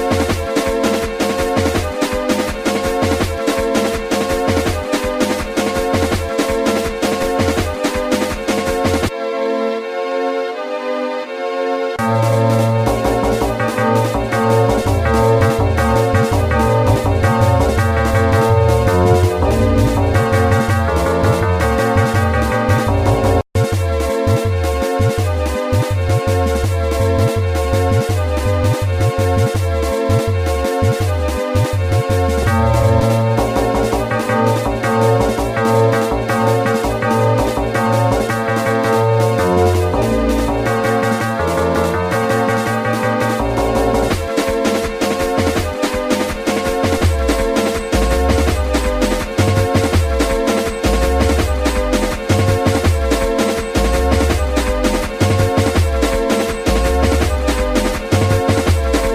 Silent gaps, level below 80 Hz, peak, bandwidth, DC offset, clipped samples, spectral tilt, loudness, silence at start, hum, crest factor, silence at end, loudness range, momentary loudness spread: none; -26 dBFS; -2 dBFS; 16 kHz; under 0.1%; under 0.1%; -6 dB/octave; -16 LUFS; 0 s; none; 14 dB; 0 s; 3 LU; 4 LU